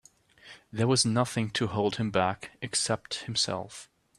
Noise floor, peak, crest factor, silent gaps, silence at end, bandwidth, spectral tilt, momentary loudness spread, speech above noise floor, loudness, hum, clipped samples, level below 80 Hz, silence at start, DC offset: -55 dBFS; -10 dBFS; 20 dB; none; 0.35 s; 13 kHz; -4 dB/octave; 13 LU; 26 dB; -28 LUFS; none; under 0.1%; -64 dBFS; 0.45 s; under 0.1%